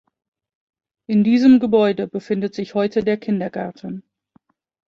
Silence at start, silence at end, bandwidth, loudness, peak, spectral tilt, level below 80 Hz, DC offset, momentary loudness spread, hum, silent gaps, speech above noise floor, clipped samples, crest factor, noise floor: 1.1 s; 0.85 s; 7 kHz; -18 LUFS; -4 dBFS; -8 dB/octave; -60 dBFS; under 0.1%; 16 LU; none; none; 43 dB; under 0.1%; 16 dB; -60 dBFS